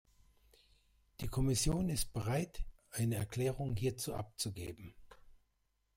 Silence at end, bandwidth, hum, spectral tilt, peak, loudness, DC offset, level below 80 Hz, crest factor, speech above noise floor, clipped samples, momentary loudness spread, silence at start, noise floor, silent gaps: 0.65 s; 16 kHz; none; -5 dB/octave; -20 dBFS; -38 LUFS; under 0.1%; -50 dBFS; 18 dB; 43 dB; under 0.1%; 14 LU; 1.2 s; -80 dBFS; none